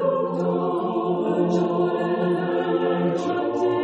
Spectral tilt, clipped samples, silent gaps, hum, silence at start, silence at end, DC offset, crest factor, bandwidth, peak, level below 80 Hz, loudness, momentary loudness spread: -8 dB/octave; under 0.1%; none; none; 0 s; 0 s; under 0.1%; 14 dB; 7.8 kHz; -10 dBFS; -66 dBFS; -23 LUFS; 2 LU